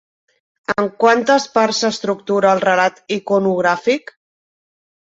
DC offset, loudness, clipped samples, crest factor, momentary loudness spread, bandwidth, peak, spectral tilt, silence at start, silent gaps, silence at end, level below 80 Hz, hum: under 0.1%; -16 LUFS; under 0.1%; 18 dB; 8 LU; 8 kHz; 0 dBFS; -4 dB/octave; 0.7 s; none; 1.1 s; -62 dBFS; none